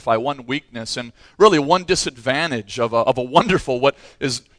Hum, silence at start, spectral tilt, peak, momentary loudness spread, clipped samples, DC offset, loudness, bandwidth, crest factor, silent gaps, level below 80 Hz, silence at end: none; 0.05 s; -4 dB/octave; 0 dBFS; 12 LU; under 0.1%; under 0.1%; -19 LUFS; 10.5 kHz; 20 dB; none; -48 dBFS; 0.2 s